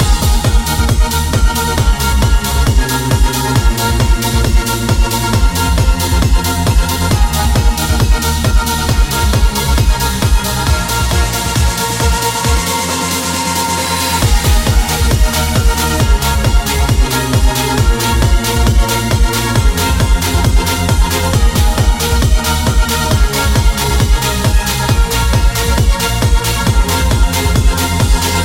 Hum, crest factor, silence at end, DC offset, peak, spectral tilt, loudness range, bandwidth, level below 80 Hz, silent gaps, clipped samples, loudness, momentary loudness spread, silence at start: none; 10 dB; 0 s; under 0.1%; 0 dBFS; -4 dB/octave; 1 LU; 17 kHz; -14 dBFS; none; under 0.1%; -13 LUFS; 1 LU; 0 s